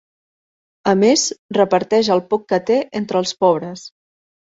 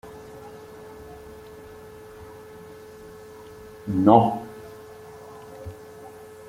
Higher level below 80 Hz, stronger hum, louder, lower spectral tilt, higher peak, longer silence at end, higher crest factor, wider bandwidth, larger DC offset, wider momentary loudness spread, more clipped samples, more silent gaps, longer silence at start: about the same, -60 dBFS vs -56 dBFS; neither; first, -17 LUFS vs -20 LUFS; second, -4 dB/octave vs -8 dB/octave; about the same, -2 dBFS vs -2 dBFS; first, 0.65 s vs 0.4 s; second, 16 dB vs 26 dB; second, 8 kHz vs 16.5 kHz; neither; second, 8 LU vs 26 LU; neither; first, 1.39-1.49 s vs none; first, 0.85 s vs 0.05 s